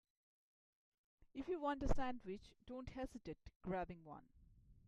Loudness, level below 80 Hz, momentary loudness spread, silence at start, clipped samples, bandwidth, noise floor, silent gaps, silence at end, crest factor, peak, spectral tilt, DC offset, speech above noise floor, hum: -48 LUFS; -54 dBFS; 14 LU; 1.2 s; under 0.1%; 10 kHz; -67 dBFS; 3.56-3.60 s; 0.15 s; 20 dB; -26 dBFS; -7 dB/octave; under 0.1%; 23 dB; none